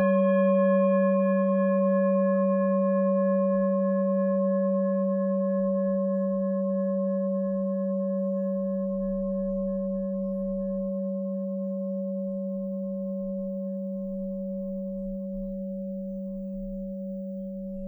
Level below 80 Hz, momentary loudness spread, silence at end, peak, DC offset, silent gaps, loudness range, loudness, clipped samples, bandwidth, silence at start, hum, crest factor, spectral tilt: -54 dBFS; 11 LU; 0 s; -14 dBFS; under 0.1%; none; 10 LU; -27 LUFS; under 0.1%; 3.4 kHz; 0 s; none; 12 dB; -12.5 dB/octave